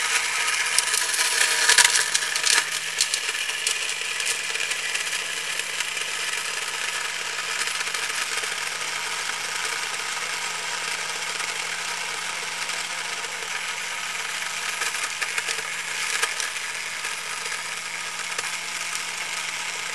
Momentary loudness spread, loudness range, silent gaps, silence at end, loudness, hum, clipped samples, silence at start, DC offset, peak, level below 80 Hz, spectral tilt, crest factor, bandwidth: 8 LU; 7 LU; none; 0 s; -24 LUFS; none; under 0.1%; 0 s; 0.3%; 0 dBFS; -70 dBFS; 2 dB/octave; 26 dB; 16 kHz